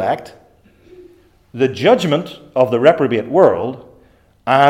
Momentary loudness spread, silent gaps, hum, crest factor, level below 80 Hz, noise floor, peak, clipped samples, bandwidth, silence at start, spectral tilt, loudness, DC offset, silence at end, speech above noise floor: 14 LU; none; none; 16 dB; -58 dBFS; -51 dBFS; 0 dBFS; under 0.1%; 15 kHz; 0 s; -6.5 dB/octave; -15 LUFS; under 0.1%; 0 s; 36 dB